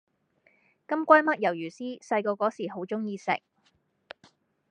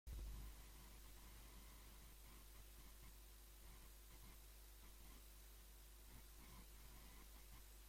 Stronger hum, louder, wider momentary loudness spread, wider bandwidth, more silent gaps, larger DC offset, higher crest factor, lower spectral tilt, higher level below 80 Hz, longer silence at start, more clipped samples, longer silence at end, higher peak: second, none vs 50 Hz at -65 dBFS; first, -27 LUFS vs -63 LUFS; first, 15 LU vs 4 LU; second, 9.2 kHz vs 16.5 kHz; neither; neither; first, 26 dB vs 16 dB; first, -5.5 dB/octave vs -3.5 dB/octave; second, -86 dBFS vs -62 dBFS; first, 0.9 s vs 0.05 s; neither; first, 1.3 s vs 0 s; first, -4 dBFS vs -44 dBFS